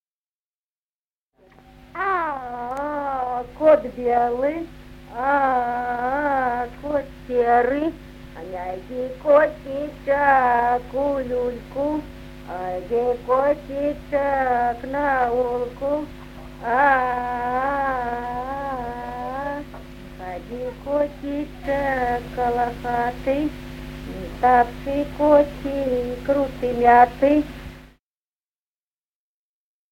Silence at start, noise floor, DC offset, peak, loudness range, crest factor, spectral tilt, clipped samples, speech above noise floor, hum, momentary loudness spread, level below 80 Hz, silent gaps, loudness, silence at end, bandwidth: 1.95 s; under -90 dBFS; under 0.1%; -2 dBFS; 7 LU; 22 dB; -7 dB/octave; under 0.1%; over 69 dB; none; 16 LU; -42 dBFS; none; -22 LUFS; 2.05 s; 16.5 kHz